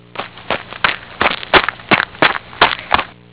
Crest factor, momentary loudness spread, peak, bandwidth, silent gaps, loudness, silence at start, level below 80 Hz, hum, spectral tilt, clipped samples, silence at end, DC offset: 16 dB; 11 LU; 0 dBFS; 4 kHz; none; -15 LUFS; 0.15 s; -42 dBFS; none; -7 dB/octave; 0.3%; 0.25 s; 0.3%